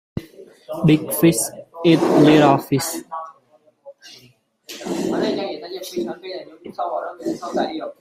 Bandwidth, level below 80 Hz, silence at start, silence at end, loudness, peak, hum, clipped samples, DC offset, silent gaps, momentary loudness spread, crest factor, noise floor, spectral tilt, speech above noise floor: 16 kHz; -56 dBFS; 0.15 s; 0.1 s; -19 LUFS; -2 dBFS; none; under 0.1%; under 0.1%; none; 20 LU; 18 dB; -57 dBFS; -5.5 dB/octave; 38 dB